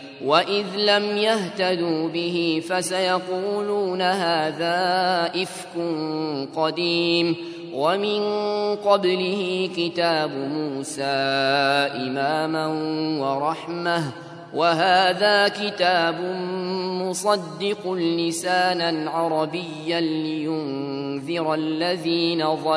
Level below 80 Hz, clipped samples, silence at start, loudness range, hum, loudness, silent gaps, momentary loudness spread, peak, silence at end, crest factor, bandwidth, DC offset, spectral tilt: -74 dBFS; under 0.1%; 0 s; 3 LU; none; -22 LUFS; none; 8 LU; -2 dBFS; 0 s; 20 dB; 11 kHz; under 0.1%; -4.5 dB/octave